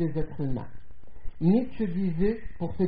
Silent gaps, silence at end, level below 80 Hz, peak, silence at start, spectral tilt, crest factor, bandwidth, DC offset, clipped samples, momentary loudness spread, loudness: none; 0 s; -40 dBFS; -12 dBFS; 0 s; -9.5 dB/octave; 16 dB; 4.9 kHz; 2%; under 0.1%; 12 LU; -29 LUFS